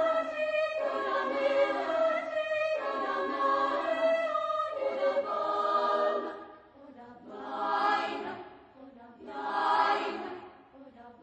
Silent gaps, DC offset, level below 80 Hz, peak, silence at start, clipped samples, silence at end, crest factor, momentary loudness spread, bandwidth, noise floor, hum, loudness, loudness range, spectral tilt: none; under 0.1%; -74 dBFS; -14 dBFS; 0 s; under 0.1%; 0.1 s; 18 dB; 16 LU; 8.6 kHz; -53 dBFS; none; -30 LUFS; 5 LU; -3.5 dB/octave